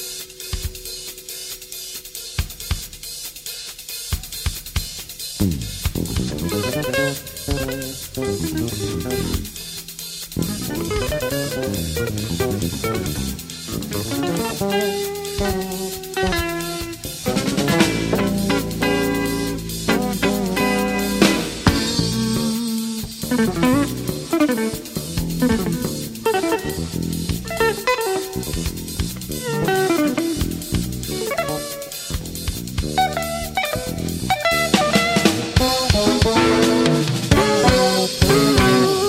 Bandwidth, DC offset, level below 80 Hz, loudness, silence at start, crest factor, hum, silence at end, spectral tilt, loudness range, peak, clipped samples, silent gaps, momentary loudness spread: 16.5 kHz; under 0.1%; -34 dBFS; -21 LUFS; 0 s; 20 dB; none; 0 s; -4.5 dB/octave; 9 LU; 0 dBFS; under 0.1%; none; 12 LU